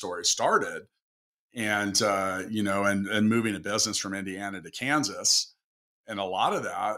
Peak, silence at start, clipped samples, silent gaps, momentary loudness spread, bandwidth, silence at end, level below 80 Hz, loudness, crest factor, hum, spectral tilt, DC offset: -10 dBFS; 0 s; under 0.1%; 1.02-1.49 s, 5.64-6.04 s; 12 LU; 16 kHz; 0 s; -70 dBFS; -26 LUFS; 18 dB; none; -2.5 dB/octave; under 0.1%